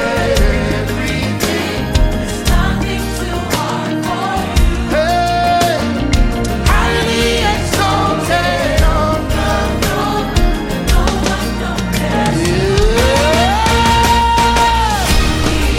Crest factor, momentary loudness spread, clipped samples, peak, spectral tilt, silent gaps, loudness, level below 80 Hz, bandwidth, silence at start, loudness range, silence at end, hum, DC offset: 12 dB; 6 LU; under 0.1%; 0 dBFS; -4.5 dB/octave; none; -14 LUFS; -18 dBFS; 16.5 kHz; 0 s; 5 LU; 0 s; none; under 0.1%